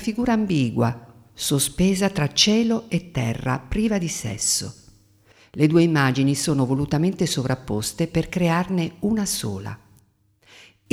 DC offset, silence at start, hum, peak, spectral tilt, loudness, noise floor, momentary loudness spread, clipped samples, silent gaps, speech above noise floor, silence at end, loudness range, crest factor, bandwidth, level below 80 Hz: under 0.1%; 0 s; none; -2 dBFS; -4.5 dB/octave; -22 LUFS; -60 dBFS; 9 LU; under 0.1%; none; 39 dB; 1.15 s; 3 LU; 20 dB; 16 kHz; -44 dBFS